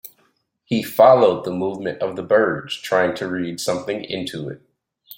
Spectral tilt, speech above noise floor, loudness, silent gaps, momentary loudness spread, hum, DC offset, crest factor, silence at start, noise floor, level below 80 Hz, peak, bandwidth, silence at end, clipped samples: -5 dB/octave; 45 dB; -19 LUFS; none; 14 LU; none; under 0.1%; 18 dB; 0.05 s; -64 dBFS; -62 dBFS; -2 dBFS; 17 kHz; 0.05 s; under 0.1%